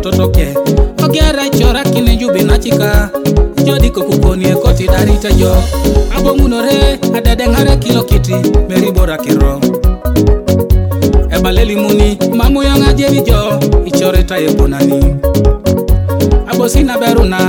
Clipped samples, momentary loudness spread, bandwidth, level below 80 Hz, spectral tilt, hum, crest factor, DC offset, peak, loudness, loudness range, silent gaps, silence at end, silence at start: 1%; 2 LU; 18 kHz; -12 dBFS; -6 dB/octave; none; 8 dB; under 0.1%; 0 dBFS; -11 LUFS; 1 LU; none; 0 s; 0 s